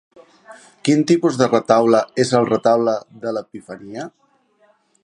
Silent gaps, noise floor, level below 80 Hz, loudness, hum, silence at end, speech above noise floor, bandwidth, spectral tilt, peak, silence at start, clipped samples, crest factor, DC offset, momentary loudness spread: none; -58 dBFS; -64 dBFS; -17 LUFS; none; 0.95 s; 41 dB; 11 kHz; -5.5 dB/octave; 0 dBFS; 0.5 s; under 0.1%; 18 dB; under 0.1%; 18 LU